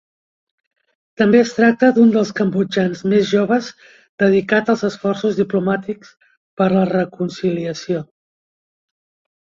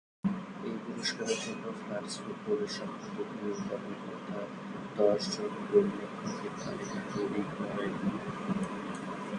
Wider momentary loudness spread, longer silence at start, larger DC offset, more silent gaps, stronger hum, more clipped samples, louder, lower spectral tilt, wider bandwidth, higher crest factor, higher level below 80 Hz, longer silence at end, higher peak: about the same, 11 LU vs 11 LU; first, 1.2 s vs 0.25 s; neither; first, 4.09-4.18 s, 6.37-6.57 s vs none; neither; neither; first, -17 LUFS vs -35 LUFS; first, -6.5 dB/octave vs -5 dB/octave; second, 7.4 kHz vs 11 kHz; second, 16 dB vs 22 dB; first, -60 dBFS vs -68 dBFS; first, 1.5 s vs 0 s; first, -2 dBFS vs -14 dBFS